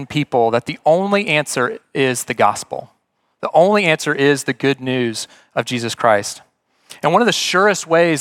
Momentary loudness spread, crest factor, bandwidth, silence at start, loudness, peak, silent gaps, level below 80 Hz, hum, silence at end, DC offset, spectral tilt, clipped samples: 11 LU; 16 dB; 17 kHz; 0 s; -16 LUFS; 0 dBFS; none; -64 dBFS; none; 0 s; under 0.1%; -4 dB/octave; under 0.1%